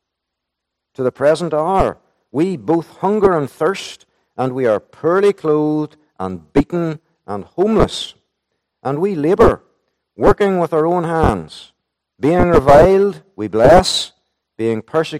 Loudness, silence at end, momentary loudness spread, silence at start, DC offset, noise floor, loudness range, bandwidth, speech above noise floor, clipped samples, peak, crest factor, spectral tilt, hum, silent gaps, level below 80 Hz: -15 LUFS; 0 s; 17 LU; 1 s; under 0.1%; -79 dBFS; 6 LU; 15 kHz; 64 dB; under 0.1%; 0 dBFS; 16 dB; -6 dB/octave; none; none; -34 dBFS